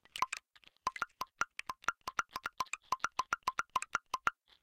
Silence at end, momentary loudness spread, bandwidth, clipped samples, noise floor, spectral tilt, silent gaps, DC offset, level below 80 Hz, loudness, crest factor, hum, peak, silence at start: 0.3 s; 5 LU; 17 kHz; under 0.1%; -57 dBFS; -0.5 dB/octave; none; under 0.1%; -70 dBFS; -39 LUFS; 28 dB; none; -12 dBFS; 0.15 s